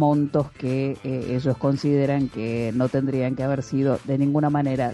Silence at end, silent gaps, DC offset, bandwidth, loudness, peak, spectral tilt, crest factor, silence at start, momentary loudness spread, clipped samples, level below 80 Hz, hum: 0 s; none; under 0.1%; 11 kHz; -23 LUFS; -8 dBFS; -8.5 dB/octave; 14 dB; 0 s; 5 LU; under 0.1%; -52 dBFS; none